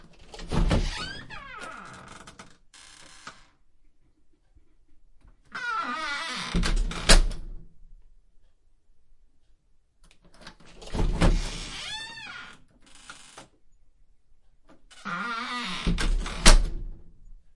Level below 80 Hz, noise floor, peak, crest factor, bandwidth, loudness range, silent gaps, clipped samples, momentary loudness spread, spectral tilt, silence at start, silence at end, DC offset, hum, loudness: -30 dBFS; -59 dBFS; -2 dBFS; 28 dB; 11.5 kHz; 18 LU; none; under 0.1%; 28 LU; -3 dB/octave; 0.25 s; 0.15 s; under 0.1%; none; -28 LUFS